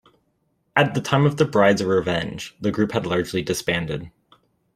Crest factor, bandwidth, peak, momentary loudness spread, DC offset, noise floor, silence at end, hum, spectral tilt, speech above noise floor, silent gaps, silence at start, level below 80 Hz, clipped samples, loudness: 20 dB; 15.5 kHz; -2 dBFS; 9 LU; under 0.1%; -69 dBFS; 0.65 s; none; -5.5 dB/octave; 48 dB; none; 0.75 s; -52 dBFS; under 0.1%; -21 LUFS